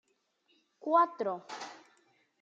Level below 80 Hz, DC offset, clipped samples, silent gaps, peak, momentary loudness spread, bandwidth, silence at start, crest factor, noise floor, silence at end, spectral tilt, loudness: under -90 dBFS; under 0.1%; under 0.1%; none; -14 dBFS; 17 LU; 7.8 kHz; 0.85 s; 20 dB; -74 dBFS; 0.65 s; -4.5 dB/octave; -31 LUFS